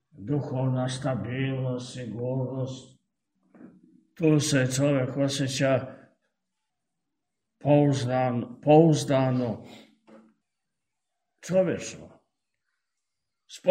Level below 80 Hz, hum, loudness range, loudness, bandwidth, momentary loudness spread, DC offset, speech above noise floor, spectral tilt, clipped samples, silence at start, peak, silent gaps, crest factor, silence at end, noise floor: -66 dBFS; none; 9 LU; -26 LUFS; 15.5 kHz; 13 LU; under 0.1%; 61 dB; -6 dB/octave; under 0.1%; 0.2 s; -6 dBFS; none; 22 dB; 0 s; -85 dBFS